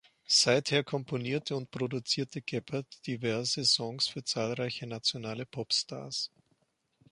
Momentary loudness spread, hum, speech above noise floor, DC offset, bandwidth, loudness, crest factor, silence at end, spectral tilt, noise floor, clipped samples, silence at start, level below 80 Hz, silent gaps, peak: 12 LU; none; 42 dB; under 0.1%; 11.5 kHz; -31 LUFS; 22 dB; 0.85 s; -3 dB/octave; -74 dBFS; under 0.1%; 0.3 s; -72 dBFS; none; -12 dBFS